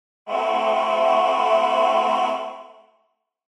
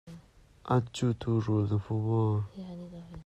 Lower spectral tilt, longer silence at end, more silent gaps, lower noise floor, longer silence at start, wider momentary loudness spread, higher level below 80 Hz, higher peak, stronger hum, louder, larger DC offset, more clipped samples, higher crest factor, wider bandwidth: second, -2.5 dB/octave vs -8 dB/octave; first, 0.85 s vs 0.05 s; neither; first, -69 dBFS vs -56 dBFS; first, 0.25 s vs 0.05 s; second, 11 LU vs 16 LU; second, -80 dBFS vs -58 dBFS; first, -6 dBFS vs -16 dBFS; neither; first, -20 LUFS vs -30 LUFS; neither; neither; about the same, 14 dB vs 16 dB; first, 11 kHz vs 8.8 kHz